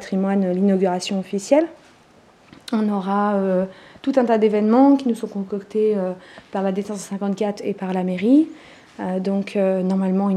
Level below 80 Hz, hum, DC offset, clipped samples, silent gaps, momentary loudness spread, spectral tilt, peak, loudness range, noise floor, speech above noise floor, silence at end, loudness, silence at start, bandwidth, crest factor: -66 dBFS; none; under 0.1%; under 0.1%; none; 11 LU; -7 dB/octave; -2 dBFS; 4 LU; -52 dBFS; 32 dB; 0 s; -20 LUFS; 0 s; 11.5 kHz; 18 dB